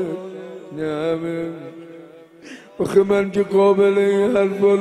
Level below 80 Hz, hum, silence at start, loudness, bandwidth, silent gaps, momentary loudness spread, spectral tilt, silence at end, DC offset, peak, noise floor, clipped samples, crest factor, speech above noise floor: -58 dBFS; none; 0 s; -18 LUFS; 12 kHz; none; 23 LU; -7 dB/octave; 0 s; under 0.1%; -2 dBFS; -42 dBFS; under 0.1%; 16 dB; 25 dB